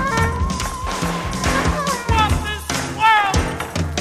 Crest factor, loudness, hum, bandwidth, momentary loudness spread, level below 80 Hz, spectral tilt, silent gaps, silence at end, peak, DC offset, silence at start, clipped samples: 14 dB; -19 LUFS; none; 15.5 kHz; 9 LU; -28 dBFS; -4 dB/octave; none; 0 s; -4 dBFS; under 0.1%; 0 s; under 0.1%